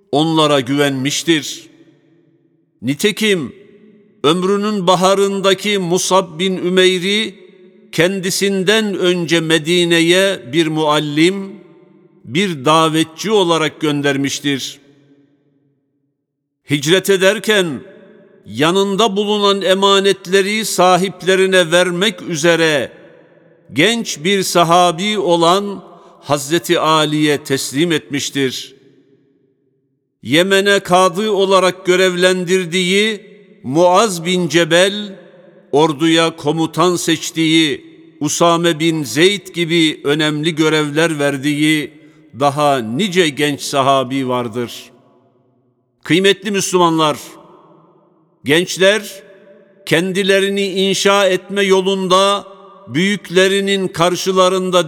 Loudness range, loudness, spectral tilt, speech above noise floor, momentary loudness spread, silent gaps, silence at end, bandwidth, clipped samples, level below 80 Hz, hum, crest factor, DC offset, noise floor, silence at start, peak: 4 LU; -14 LUFS; -4 dB/octave; 59 dB; 8 LU; none; 0 s; 18 kHz; under 0.1%; -64 dBFS; none; 16 dB; under 0.1%; -73 dBFS; 0.1 s; 0 dBFS